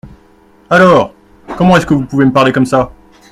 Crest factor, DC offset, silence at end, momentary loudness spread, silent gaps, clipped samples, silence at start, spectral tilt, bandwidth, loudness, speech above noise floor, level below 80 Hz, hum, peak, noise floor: 12 dB; under 0.1%; 0.45 s; 12 LU; none; 0.2%; 0.05 s; -6.5 dB/octave; 12.5 kHz; -10 LUFS; 36 dB; -38 dBFS; none; 0 dBFS; -45 dBFS